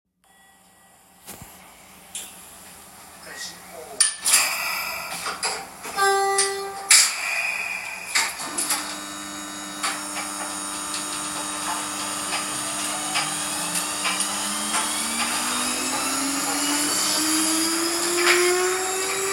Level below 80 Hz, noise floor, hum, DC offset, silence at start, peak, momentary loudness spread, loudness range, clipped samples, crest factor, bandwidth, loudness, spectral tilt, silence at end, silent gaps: -60 dBFS; -56 dBFS; none; under 0.1%; 1.25 s; -2 dBFS; 17 LU; 7 LU; under 0.1%; 24 dB; 16.5 kHz; -22 LUFS; 0 dB/octave; 0 s; none